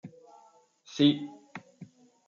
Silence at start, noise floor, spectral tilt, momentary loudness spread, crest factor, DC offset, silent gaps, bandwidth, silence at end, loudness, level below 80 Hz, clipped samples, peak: 0.05 s; -61 dBFS; -6 dB/octave; 23 LU; 20 dB; under 0.1%; none; 7.2 kHz; 0.45 s; -27 LUFS; -78 dBFS; under 0.1%; -12 dBFS